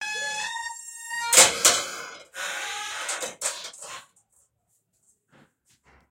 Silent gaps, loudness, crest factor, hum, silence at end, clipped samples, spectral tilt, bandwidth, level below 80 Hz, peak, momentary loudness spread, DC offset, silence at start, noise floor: none; -22 LUFS; 26 dB; none; 2.1 s; under 0.1%; 1.5 dB/octave; 16 kHz; -68 dBFS; 0 dBFS; 22 LU; under 0.1%; 0 s; -72 dBFS